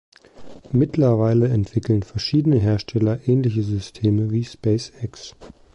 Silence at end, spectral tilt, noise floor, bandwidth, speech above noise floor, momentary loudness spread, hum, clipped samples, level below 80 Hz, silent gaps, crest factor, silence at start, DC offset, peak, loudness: 0.25 s; -8 dB/octave; -40 dBFS; 8.4 kHz; 20 dB; 10 LU; none; under 0.1%; -44 dBFS; none; 12 dB; 0.4 s; under 0.1%; -8 dBFS; -20 LUFS